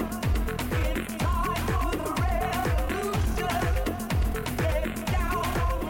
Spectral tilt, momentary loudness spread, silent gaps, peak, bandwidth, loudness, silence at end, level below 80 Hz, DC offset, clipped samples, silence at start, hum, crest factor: -5.5 dB/octave; 2 LU; none; -18 dBFS; 17 kHz; -28 LUFS; 0 s; -30 dBFS; under 0.1%; under 0.1%; 0 s; none; 10 dB